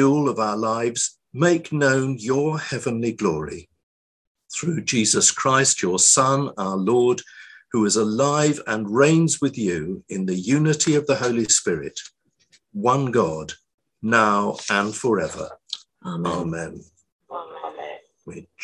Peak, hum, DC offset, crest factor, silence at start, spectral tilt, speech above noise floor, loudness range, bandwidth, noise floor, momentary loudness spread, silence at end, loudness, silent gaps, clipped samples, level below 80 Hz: -2 dBFS; none; under 0.1%; 20 dB; 0 s; -4 dB/octave; 40 dB; 7 LU; 12 kHz; -61 dBFS; 18 LU; 0 s; -20 LUFS; 3.83-4.35 s, 13.74-13.78 s, 17.12-17.19 s; under 0.1%; -56 dBFS